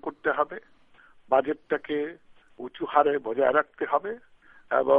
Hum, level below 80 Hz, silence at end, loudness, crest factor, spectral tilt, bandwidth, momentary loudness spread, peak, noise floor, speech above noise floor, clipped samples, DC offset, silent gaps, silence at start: none; -68 dBFS; 0 s; -27 LUFS; 22 dB; -7.5 dB/octave; 3.9 kHz; 15 LU; -6 dBFS; -55 dBFS; 30 dB; under 0.1%; under 0.1%; none; 0.05 s